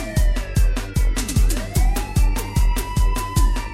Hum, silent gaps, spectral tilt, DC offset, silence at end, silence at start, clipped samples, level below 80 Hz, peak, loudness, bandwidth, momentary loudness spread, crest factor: none; none; -5 dB/octave; under 0.1%; 0 s; 0 s; under 0.1%; -18 dBFS; -6 dBFS; -22 LUFS; 16 kHz; 1 LU; 12 dB